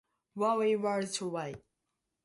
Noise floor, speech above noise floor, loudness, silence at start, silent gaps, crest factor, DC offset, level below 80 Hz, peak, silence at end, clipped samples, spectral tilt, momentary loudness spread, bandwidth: -85 dBFS; 53 dB; -32 LUFS; 0.35 s; none; 16 dB; under 0.1%; -74 dBFS; -18 dBFS; 0.7 s; under 0.1%; -4.5 dB/octave; 17 LU; 11.5 kHz